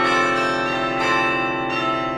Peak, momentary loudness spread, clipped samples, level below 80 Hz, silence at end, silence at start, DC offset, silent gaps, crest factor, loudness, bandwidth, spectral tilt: -6 dBFS; 4 LU; under 0.1%; -50 dBFS; 0 s; 0 s; under 0.1%; none; 14 dB; -20 LUFS; 12 kHz; -4 dB/octave